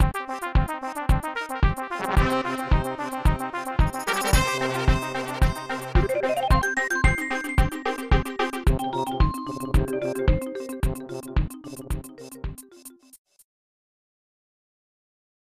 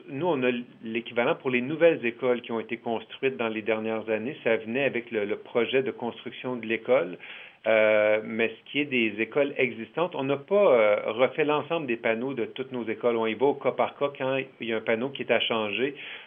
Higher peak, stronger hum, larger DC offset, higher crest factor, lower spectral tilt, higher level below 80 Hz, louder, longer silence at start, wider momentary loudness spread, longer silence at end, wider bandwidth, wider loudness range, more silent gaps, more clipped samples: about the same, -6 dBFS vs -8 dBFS; neither; first, 0.3% vs under 0.1%; about the same, 18 dB vs 18 dB; second, -5.5 dB/octave vs -8.5 dB/octave; first, -28 dBFS vs -86 dBFS; about the same, -25 LUFS vs -27 LUFS; about the same, 0 s vs 0.05 s; about the same, 12 LU vs 10 LU; first, 2.3 s vs 0 s; first, 15 kHz vs 3.8 kHz; first, 12 LU vs 4 LU; neither; neither